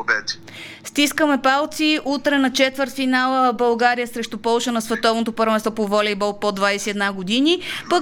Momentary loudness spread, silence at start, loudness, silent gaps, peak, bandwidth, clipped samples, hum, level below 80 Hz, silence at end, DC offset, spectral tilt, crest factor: 6 LU; 0 s; -19 LUFS; none; -4 dBFS; 18.5 kHz; under 0.1%; none; -56 dBFS; 0 s; under 0.1%; -3 dB/octave; 16 dB